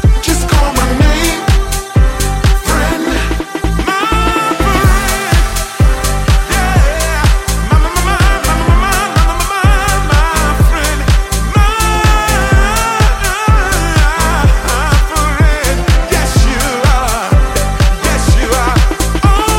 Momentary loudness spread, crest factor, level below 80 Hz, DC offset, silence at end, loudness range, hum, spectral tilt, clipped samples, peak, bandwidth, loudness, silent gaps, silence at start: 3 LU; 10 dB; -12 dBFS; 0.6%; 0 s; 1 LU; none; -4.5 dB/octave; under 0.1%; 0 dBFS; 16.5 kHz; -12 LUFS; none; 0 s